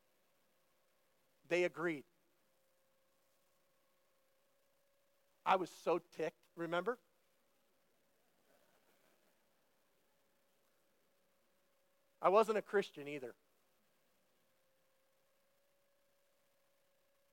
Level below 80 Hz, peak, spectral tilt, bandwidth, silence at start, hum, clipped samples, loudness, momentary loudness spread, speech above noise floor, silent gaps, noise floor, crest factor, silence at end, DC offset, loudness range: under -90 dBFS; -18 dBFS; -5 dB/octave; 16.5 kHz; 1.5 s; none; under 0.1%; -38 LUFS; 15 LU; 42 dB; none; -79 dBFS; 28 dB; 4 s; under 0.1%; 10 LU